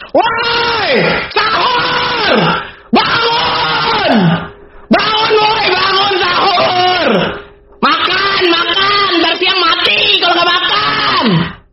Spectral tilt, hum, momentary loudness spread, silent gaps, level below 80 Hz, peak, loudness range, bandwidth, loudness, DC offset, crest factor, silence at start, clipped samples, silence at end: -1.5 dB/octave; none; 5 LU; none; -44 dBFS; 0 dBFS; 2 LU; 6.4 kHz; -10 LUFS; 0.2%; 12 dB; 0 s; under 0.1%; 0.15 s